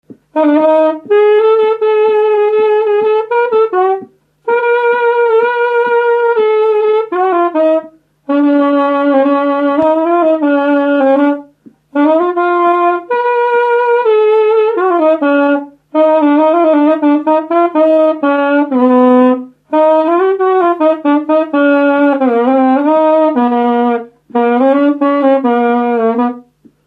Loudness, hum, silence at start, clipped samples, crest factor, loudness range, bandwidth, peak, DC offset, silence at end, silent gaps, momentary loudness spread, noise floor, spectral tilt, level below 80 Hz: -11 LUFS; none; 0.1 s; under 0.1%; 10 dB; 2 LU; 4.8 kHz; 0 dBFS; under 0.1%; 0.45 s; none; 5 LU; -43 dBFS; -7 dB/octave; -68 dBFS